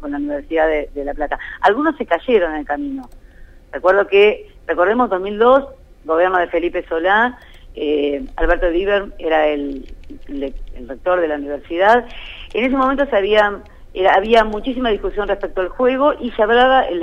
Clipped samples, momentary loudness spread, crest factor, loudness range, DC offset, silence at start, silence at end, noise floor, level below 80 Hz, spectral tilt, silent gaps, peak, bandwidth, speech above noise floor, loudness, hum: under 0.1%; 14 LU; 16 dB; 4 LU; under 0.1%; 0 s; 0 s; -39 dBFS; -34 dBFS; -6 dB/octave; none; -2 dBFS; 8.4 kHz; 22 dB; -17 LUFS; none